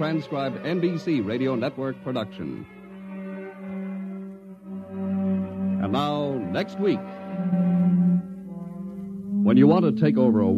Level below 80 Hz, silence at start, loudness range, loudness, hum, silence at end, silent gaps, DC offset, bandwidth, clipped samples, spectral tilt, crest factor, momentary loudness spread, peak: -64 dBFS; 0 s; 10 LU; -24 LUFS; none; 0 s; none; under 0.1%; 7 kHz; under 0.1%; -9 dB/octave; 18 dB; 17 LU; -6 dBFS